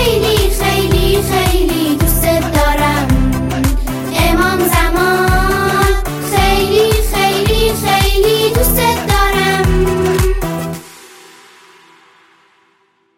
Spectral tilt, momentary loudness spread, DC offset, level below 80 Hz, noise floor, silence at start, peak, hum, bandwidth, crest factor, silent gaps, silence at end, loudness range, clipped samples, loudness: -4.5 dB/octave; 5 LU; under 0.1%; -20 dBFS; -57 dBFS; 0 s; 0 dBFS; none; 17 kHz; 12 dB; none; 2.1 s; 4 LU; under 0.1%; -13 LUFS